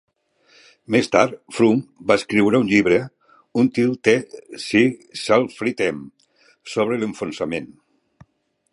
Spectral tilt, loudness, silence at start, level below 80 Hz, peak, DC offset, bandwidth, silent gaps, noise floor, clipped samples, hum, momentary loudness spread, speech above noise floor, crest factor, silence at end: -5.5 dB/octave; -20 LUFS; 0.9 s; -58 dBFS; 0 dBFS; under 0.1%; 11.5 kHz; none; -63 dBFS; under 0.1%; none; 11 LU; 44 dB; 20 dB; 1.05 s